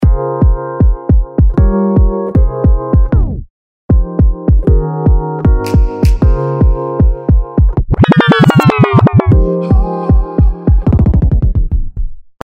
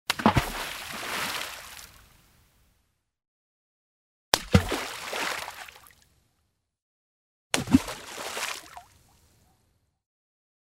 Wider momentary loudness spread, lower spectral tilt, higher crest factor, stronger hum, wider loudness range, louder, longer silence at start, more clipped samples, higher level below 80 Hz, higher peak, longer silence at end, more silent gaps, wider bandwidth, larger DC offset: second, 5 LU vs 19 LU; first, -8.5 dB/octave vs -4 dB/octave; second, 10 dB vs 30 dB; neither; second, 3 LU vs 6 LU; first, -12 LUFS vs -28 LUFS; about the same, 0 s vs 0.1 s; first, 0.3% vs under 0.1%; first, -12 dBFS vs -48 dBFS; about the same, 0 dBFS vs -2 dBFS; second, 0.25 s vs 1.95 s; second, 3.50-3.89 s vs 3.28-4.32 s, 6.82-7.50 s; second, 8.2 kHz vs 16 kHz; neither